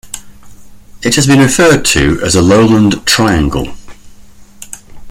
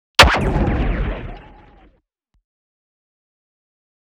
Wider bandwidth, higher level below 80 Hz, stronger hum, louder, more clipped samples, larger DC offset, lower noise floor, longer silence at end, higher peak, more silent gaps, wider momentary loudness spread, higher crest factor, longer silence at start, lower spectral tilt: about the same, 16.5 kHz vs 17 kHz; about the same, -28 dBFS vs -26 dBFS; neither; first, -9 LUFS vs -16 LUFS; neither; neither; second, -35 dBFS vs -64 dBFS; second, 0 s vs 2.6 s; about the same, 0 dBFS vs 0 dBFS; neither; about the same, 21 LU vs 20 LU; second, 12 dB vs 20 dB; second, 0.05 s vs 0.2 s; about the same, -4.5 dB/octave vs -4 dB/octave